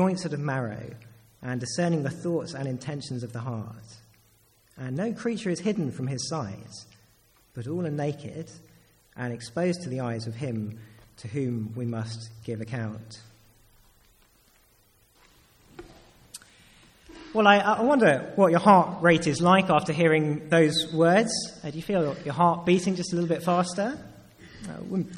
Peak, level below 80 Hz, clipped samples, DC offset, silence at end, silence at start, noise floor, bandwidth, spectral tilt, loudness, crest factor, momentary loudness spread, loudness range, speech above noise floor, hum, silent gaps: -4 dBFS; -62 dBFS; under 0.1%; under 0.1%; 0 s; 0 s; -62 dBFS; 14 kHz; -5.5 dB/octave; -25 LUFS; 22 dB; 20 LU; 14 LU; 37 dB; none; none